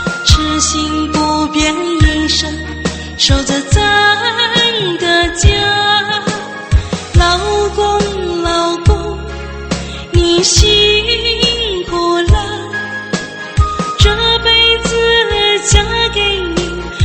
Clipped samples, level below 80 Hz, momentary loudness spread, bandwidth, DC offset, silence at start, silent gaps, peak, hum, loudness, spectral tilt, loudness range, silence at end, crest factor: 0.2%; -20 dBFS; 11 LU; 8.8 kHz; under 0.1%; 0 s; none; 0 dBFS; none; -12 LUFS; -3.5 dB/octave; 3 LU; 0 s; 12 dB